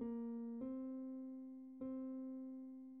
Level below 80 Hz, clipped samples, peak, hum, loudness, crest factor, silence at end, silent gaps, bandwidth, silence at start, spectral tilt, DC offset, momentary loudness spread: -82 dBFS; under 0.1%; -36 dBFS; none; -49 LUFS; 12 dB; 0 s; none; 2.5 kHz; 0 s; -7.5 dB/octave; under 0.1%; 7 LU